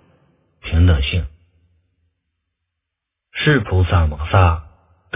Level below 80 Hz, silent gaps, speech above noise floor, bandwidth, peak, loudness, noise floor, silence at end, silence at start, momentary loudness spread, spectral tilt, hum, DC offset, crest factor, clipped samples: -24 dBFS; none; 66 dB; 3.8 kHz; 0 dBFS; -17 LUFS; -81 dBFS; 0.55 s; 0.65 s; 14 LU; -10.5 dB/octave; none; under 0.1%; 20 dB; under 0.1%